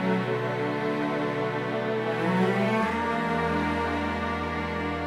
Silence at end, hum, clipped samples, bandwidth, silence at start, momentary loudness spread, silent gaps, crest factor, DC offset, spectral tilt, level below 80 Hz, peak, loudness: 0 s; none; under 0.1%; 13 kHz; 0 s; 5 LU; none; 14 dB; under 0.1%; -7 dB/octave; -48 dBFS; -12 dBFS; -27 LUFS